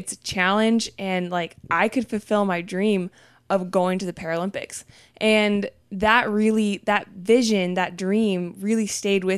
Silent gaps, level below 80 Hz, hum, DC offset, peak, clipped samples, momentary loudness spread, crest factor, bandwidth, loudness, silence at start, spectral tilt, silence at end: none; -56 dBFS; none; under 0.1%; -4 dBFS; under 0.1%; 9 LU; 18 dB; 13.5 kHz; -22 LUFS; 0 s; -4.5 dB/octave; 0 s